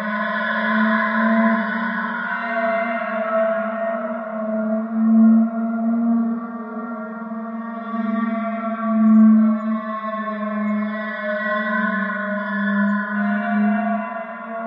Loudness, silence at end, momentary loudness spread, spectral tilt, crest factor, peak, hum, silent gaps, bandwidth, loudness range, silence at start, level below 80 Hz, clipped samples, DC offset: -20 LUFS; 0 s; 13 LU; -10 dB/octave; 14 dB; -6 dBFS; none; none; 5.2 kHz; 4 LU; 0 s; -74 dBFS; under 0.1%; under 0.1%